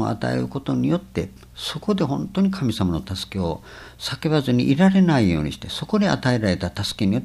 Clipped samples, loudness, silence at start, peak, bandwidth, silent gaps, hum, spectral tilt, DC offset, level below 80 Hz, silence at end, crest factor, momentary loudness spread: under 0.1%; -22 LUFS; 0 s; -4 dBFS; 13 kHz; none; none; -6.5 dB/octave; under 0.1%; -44 dBFS; 0 s; 16 dB; 13 LU